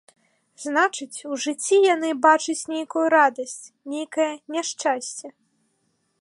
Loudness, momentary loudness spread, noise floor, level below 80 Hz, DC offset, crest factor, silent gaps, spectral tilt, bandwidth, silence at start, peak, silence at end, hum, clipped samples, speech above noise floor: -22 LUFS; 15 LU; -70 dBFS; -82 dBFS; under 0.1%; 20 dB; none; -1 dB/octave; 11.5 kHz; 0.6 s; -4 dBFS; 0.9 s; none; under 0.1%; 48 dB